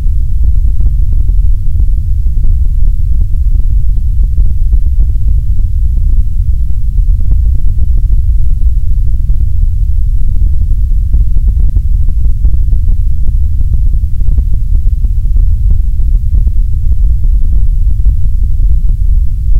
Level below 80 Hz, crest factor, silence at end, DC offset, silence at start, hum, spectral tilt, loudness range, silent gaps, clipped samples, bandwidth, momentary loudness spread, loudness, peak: -8 dBFS; 6 dB; 0 s; under 0.1%; 0 s; none; -9.5 dB/octave; 0 LU; none; 3%; 0.7 kHz; 2 LU; -14 LUFS; 0 dBFS